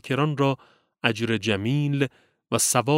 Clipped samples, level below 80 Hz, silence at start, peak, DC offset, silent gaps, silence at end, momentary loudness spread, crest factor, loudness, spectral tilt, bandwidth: under 0.1%; -66 dBFS; 0.05 s; -2 dBFS; under 0.1%; none; 0 s; 7 LU; 22 dB; -24 LUFS; -4.5 dB/octave; 16 kHz